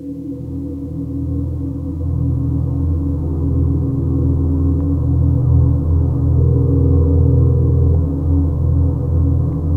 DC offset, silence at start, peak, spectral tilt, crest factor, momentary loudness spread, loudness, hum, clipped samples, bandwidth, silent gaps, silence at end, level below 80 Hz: under 0.1%; 0 s; -2 dBFS; -13 dB/octave; 12 dB; 10 LU; -17 LUFS; none; under 0.1%; 1.5 kHz; none; 0 s; -22 dBFS